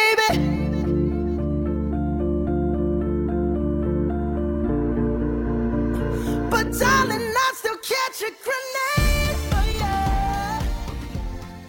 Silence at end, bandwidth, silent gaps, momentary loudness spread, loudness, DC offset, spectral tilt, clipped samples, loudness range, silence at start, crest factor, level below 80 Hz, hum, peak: 0 s; 17 kHz; none; 7 LU; -23 LUFS; under 0.1%; -5.5 dB/octave; under 0.1%; 2 LU; 0 s; 16 dB; -28 dBFS; none; -6 dBFS